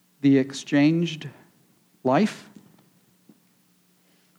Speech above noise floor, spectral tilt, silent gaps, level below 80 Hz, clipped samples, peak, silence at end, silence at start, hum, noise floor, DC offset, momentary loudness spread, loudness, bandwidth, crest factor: 41 dB; -6.5 dB/octave; none; -80 dBFS; under 0.1%; -8 dBFS; 2 s; 0.25 s; none; -63 dBFS; under 0.1%; 17 LU; -23 LUFS; 11 kHz; 18 dB